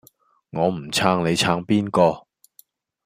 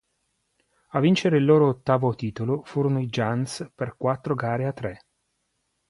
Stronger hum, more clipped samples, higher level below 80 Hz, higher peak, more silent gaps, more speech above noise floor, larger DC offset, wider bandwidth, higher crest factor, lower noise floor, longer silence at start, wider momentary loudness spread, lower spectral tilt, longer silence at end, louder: neither; neither; about the same, -58 dBFS vs -60 dBFS; first, -2 dBFS vs -6 dBFS; neither; second, 37 dB vs 51 dB; neither; first, 15.5 kHz vs 11.5 kHz; about the same, 20 dB vs 18 dB; second, -57 dBFS vs -75 dBFS; second, 0.55 s vs 0.95 s; second, 6 LU vs 12 LU; second, -5 dB/octave vs -7 dB/octave; about the same, 0.85 s vs 0.95 s; first, -20 LUFS vs -24 LUFS